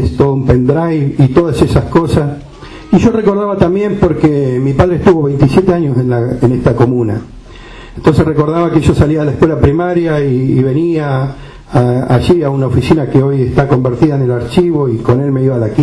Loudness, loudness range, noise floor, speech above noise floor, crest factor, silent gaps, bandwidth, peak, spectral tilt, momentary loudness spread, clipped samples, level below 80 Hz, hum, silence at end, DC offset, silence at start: -11 LUFS; 1 LU; -31 dBFS; 21 dB; 10 dB; none; 11 kHz; 0 dBFS; -8.5 dB/octave; 4 LU; under 0.1%; -28 dBFS; none; 0 s; under 0.1%; 0 s